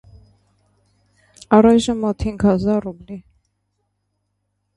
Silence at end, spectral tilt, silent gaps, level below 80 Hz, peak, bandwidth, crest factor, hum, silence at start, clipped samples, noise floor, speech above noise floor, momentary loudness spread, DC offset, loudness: 1.55 s; -6.5 dB/octave; none; -42 dBFS; 0 dBFS; 11.5 kHz; 20 dB; 50 Hz at -40 dBFS; 1.5 s; under 0.1%; -72 dBFS; 56 dB; 23 LU; under 0.1%; -17 LUFS